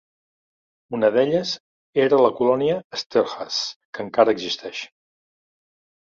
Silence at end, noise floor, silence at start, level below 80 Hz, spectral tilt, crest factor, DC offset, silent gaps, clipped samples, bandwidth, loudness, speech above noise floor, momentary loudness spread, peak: 1.25 s; under -90 dBFS; 0.9 s; -66 dBFS; -4.5 dB/octave; 20 dB; under 0.1%; 1.60-1.93 s, 2.84-2.90 s, 3.06-3.10 s, 3.76-3.93 s; under 0.1%; 7.6 kHz; -21 LUFS; over 70 dB; 15 LU; -2 dBFS